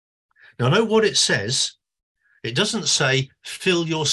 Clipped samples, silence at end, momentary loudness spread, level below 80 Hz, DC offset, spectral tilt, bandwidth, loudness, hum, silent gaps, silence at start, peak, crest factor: under 0.1%; 0 s; 8 LU; -58 dBFS; under 0.1%; -3 dB/octave; 12.5 kHz; -20 LUFS; none; 2.03-2.15 s; 0.6 s; -6 dBFS; 16 dB